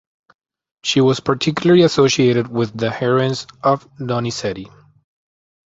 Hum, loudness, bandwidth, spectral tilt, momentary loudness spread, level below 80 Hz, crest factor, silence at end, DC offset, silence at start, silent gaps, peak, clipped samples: none; -17 LUFS; 8 kHz; -5.5 dB/octave; 11 LU; -54 dBFS; 16 dB; 1.1 s; under 0.1%; 0.85 s; none; -2 dBFS; under 0.1%